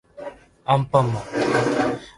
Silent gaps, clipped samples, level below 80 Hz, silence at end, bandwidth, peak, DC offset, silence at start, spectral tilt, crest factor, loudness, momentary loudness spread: none; under 0.1%; -52 dBFS; 0.1 s; 11.5 kHz; -4 dBFS; under 0.1%; 0.15 s; -6.5 dB/octave; 18 dB; -21 LUFS; 19 LU